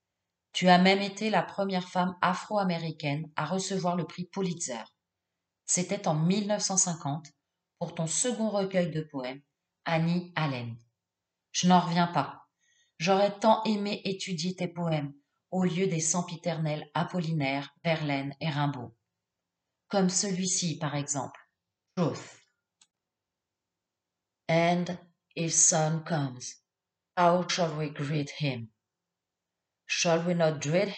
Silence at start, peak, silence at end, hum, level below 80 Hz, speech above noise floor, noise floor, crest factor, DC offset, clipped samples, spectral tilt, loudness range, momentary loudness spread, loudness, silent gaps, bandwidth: 0.55 s; -6 dBFS; 0 s; none; -78 dBFS; 60 dB; -89 dBFS; 24 dB; under 0.1%; under 0.1%; -4 dB/octave; 5 LU; 13 LU; -29 LUFS; none; 9.4 kHz